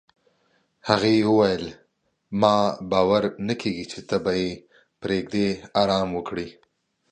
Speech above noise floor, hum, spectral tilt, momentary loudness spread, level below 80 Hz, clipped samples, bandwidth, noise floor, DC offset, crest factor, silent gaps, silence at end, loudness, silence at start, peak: 46 dB; none; -6 dB/octave; 14 LU; -54 dBFS; under 0.1%; 9.6 kHz; -68 dBFS; under 0.1%; 22 dB; none; 0.6 s; -23 LUFS; 0.85 s; -2 dBFS